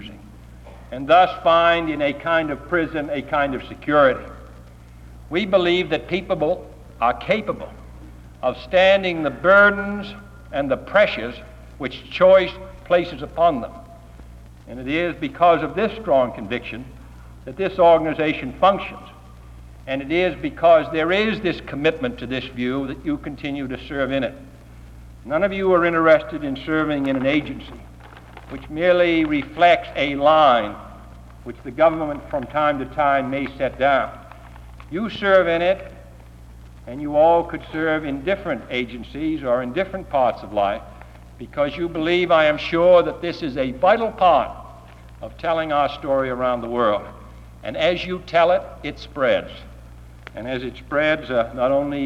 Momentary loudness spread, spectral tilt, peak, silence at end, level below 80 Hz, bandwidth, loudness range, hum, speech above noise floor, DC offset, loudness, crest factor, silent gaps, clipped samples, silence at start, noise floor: 17 LU; -6.5 dB/octave; -2 dBFS; 0 s; -44 dBFS; 9.6 kHz; 5 LU; 60 Hz at -45 dBFS; 23 dB; under 0.1%; -20 LUFS; 18 dB; none; under 0.1%; 0 s; -42 dBFS